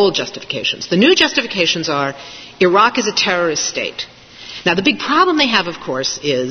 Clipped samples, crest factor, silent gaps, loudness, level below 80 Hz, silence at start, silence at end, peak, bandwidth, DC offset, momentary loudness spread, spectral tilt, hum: under 0.1%; 16 dB; none; -15 LUFS; -54 dBFS; 0 s; 0 s; 0 dBFS; 6.6 kHz; under 0.1%; 12 LU; -3 dB/octave; none